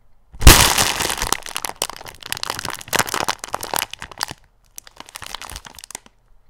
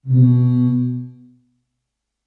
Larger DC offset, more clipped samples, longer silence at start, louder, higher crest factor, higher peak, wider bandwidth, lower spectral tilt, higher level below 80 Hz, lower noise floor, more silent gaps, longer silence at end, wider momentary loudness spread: neither; first, 0.3% vs under 0.1%; first, 0.35 s vs 0.05 s; about the same, -18 LUFS vs -16 LUFS; first, 20 dB vs 14 dB; first, 0 dBFS vs -4 dBFS; first, over 20 kHz vs 3.9 kHz; second, -2.5 dB/octave vs -13 dB/octave; first, -26 dBFS vs -60 dBFS; second, -50 dBFS vs -78 dBFS; neither; second, 0.8 s vs 1.15 s; first, 24 LU vs 16 LU